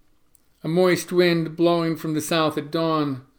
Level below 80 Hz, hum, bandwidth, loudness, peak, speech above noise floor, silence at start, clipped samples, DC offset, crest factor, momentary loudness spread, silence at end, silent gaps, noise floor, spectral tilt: -66 dBFS; none; over 20 kHz; -22 LUFS; -6 dBFS; 37 dB; 0.65 s; under 0.1%; under 0.1%; 16 dB; 6 LU; 0.15 s; none; -59 dBFS; -5.5 dB/octave